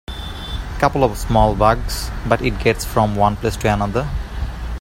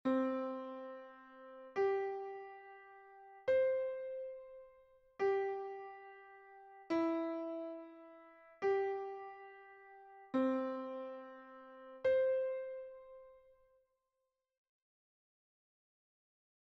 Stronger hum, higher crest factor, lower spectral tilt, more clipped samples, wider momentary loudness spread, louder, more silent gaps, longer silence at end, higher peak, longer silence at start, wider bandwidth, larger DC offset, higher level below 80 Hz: neither; about the same, 18 dB vs 16 dB; first, -5.5 dB/octave vs -3.5 dB/octave; neither; second, 12 LU vs 22 LU; first, -19 LUFS vs -39 LUFS; neither; second, 0 s vs 3.35 s; first, 0 dBFS vs -24 dBFS; about the same, 0.1 s vs 0.05 s; first, 16.5 kHz vs 6.4 kHz; neither; first, -26 dBFS vs -82 dBFS